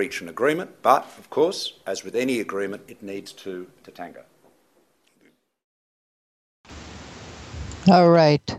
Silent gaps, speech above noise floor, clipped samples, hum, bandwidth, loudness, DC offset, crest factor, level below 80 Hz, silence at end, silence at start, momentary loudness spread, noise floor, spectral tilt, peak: 5.64-6.64 s; 42 dB; under 0.1%; none; 14 kHz; -21 LUFS; under 0.1%; 22 dB; -52 dBFS; 0 s; 0 s; 25 LU; -64 dBFS; -6 dB/octave; -2 dBFS